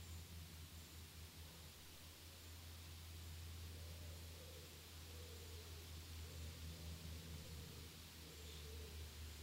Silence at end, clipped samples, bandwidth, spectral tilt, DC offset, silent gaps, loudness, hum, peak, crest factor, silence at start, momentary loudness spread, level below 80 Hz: 0 s; under 0.1%; 16 kHz; -3.5 dB/octave; under 0.1%; none; -55 LUFS; none; -42 dBFS; 14 dB; 0 s; 4 LU; -60 dBFS